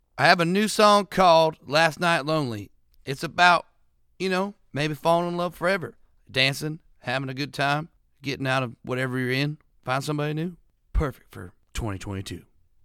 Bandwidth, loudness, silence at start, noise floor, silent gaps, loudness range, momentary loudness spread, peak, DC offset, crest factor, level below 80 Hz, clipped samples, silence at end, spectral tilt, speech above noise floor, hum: 16.5 kHz; -24 LUFS; 0.15 s; -62 dBFS; none; 8 LU; 17 LU; -2 dBFS; under 0.1%; 24 dB; -42 dBFS; under 0.1%; 0.45 s; -4.5 dB/octave; 39 dB; none